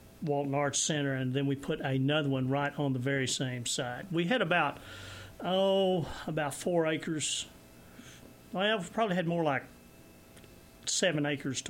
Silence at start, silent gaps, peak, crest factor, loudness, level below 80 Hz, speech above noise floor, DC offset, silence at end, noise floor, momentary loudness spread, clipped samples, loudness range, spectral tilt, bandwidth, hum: 0.05 s; none; -16 dBFS; 16 dB; -31 LUFS; -62 dBFS; 24 dB; under 0.1%; 0 s; -55 dBFS; 11 LU; under 0.1%; 3 LU; -4 dB/octave; 17 kHz; none